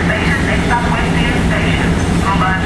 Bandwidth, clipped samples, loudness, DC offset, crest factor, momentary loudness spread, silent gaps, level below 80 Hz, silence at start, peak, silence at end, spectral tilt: 12.5 kHz; under 0.1%; -14 LUFS; under 0.1%; 12 dB; 1 LU; none; -22 dBFS; 0 s; -2 dBFS; 0 s; -5.5 dB/octave